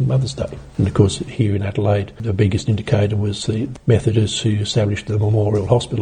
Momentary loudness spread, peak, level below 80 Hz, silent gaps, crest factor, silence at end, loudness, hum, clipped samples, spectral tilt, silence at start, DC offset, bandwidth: 6 LU; -2 dBFS; -40 dBFS; none; 16 dB; 0 s; -19 LUFS; none; under 0.1%; -6.5 dB/octave; 0 s; under 0.1%; 9.8 kHz